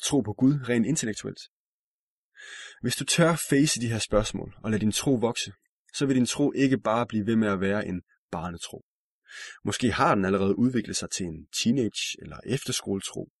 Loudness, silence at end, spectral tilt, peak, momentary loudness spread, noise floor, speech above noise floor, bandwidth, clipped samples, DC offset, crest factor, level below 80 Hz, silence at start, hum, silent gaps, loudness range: -26 LUFS; 0.15 s; -4.5 dB/octave; -8 dBFS; 15 LU; under -90 dBFS; over 64 dB; 12 kHz; under 0.1%; under 0.1%; 18 dB; -50 dBFS; 0 s; none; 1.48-2.32 s, 5.69-5.85 s, 8.18-8.29 s, 8.83-9.22 s; 3 LU